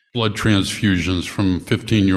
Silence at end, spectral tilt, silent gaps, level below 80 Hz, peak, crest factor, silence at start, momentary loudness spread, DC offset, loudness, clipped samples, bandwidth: 0 s; -5.5 dB/octave; none; -42 dBFS; -4 dBFS; 16 dB; 0.15 s; 4 LU; under 0.1%; -19 LUFS; under 0.1%; 14 kHz